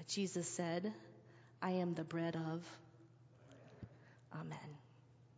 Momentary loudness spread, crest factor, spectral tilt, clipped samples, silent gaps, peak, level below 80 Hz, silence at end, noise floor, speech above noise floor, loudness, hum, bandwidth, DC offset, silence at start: 23 LU; 20 dB; -5 dB/octave; under 0.1%; none; -26 dBFS; -78 dBFS; 0.1 s; -66 dBFS; 23 dB; -43 LUFS; none; 8 kHz; under 0.1%; 0 s